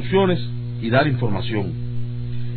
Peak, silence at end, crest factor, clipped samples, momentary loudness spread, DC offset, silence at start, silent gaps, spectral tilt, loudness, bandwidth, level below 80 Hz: -4 dBFS; 0 s; 16 dB; under 0.1%; 10 LU; under 0.1%; 0 s; none; -11 dB/octave; -22 LUFS; 4.5 kHz; -42 dBFS